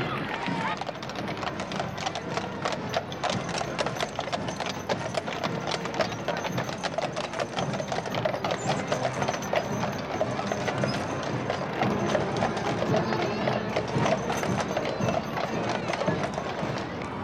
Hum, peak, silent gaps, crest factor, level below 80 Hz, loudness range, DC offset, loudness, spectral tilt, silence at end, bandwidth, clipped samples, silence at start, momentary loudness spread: none; -10 dBFS; none; 18 dB; -54 dBFS; 3 LU; under 0.1%; -29 LUFS; -5 dB/octave; 0 s; 16 kHz; under 0.1%; 0 s; 5 LU